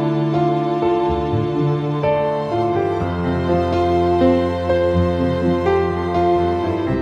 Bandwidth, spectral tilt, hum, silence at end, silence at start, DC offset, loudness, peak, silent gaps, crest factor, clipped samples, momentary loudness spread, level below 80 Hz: 7.6 kHz; -8.5 dB/octave; none; 0 s; 0 s; under 0.1%; -18 LUFS; -4 dBFS; none; 14 dB; under 0.1%; 4 LU; -38 dBFS